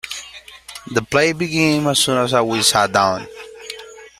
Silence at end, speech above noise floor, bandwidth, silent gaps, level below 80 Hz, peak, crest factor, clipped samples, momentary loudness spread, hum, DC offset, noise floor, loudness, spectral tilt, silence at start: 0.1 s; 22 dB; 16 kHz; none; -54 dBFS; 0 dBFS; 18 dB; under 0.1%; 20 LU; none; under 0.1%; -39 dBFS; -16 LUFS; -3.5 dB/octave; 0.05 s